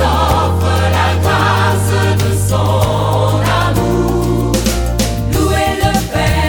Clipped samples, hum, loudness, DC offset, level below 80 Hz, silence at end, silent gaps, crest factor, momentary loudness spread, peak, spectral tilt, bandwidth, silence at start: under 0.1%; none; -13 LUFS; under 0.1%; -22 dBFS; 0 s; none; 12 dB; 3 LU; 0 dBFS; -5.5 dB/octave; 18.5 kHz; 0 s